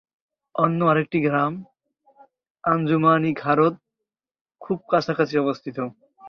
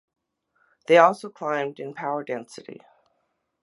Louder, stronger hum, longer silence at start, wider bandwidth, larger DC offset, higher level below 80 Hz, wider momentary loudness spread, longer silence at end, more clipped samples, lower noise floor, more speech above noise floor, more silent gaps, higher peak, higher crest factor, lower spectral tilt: about the same, -22 LUFS vs -23 LUFS; neither; second, 0.55 s vs 0.9 s; second, 6.6 kHz vs 11.5 kHz; neither; first, -64 dBFS vs -82 dBFS; second, 12 LU vs 25 LU; second, 0 s vs 0.9 s; neither; first, -85 dBFS vs -74 dBFS; first, 64 dB vs 51 dB; first, 2.50-2.55 s, 4.41-4.45 s vs none; second, -6 dBFS vs -2 dBFS; second, 18 dB vs 24 dB; first, -8 dB/octave vs -5 dB/octave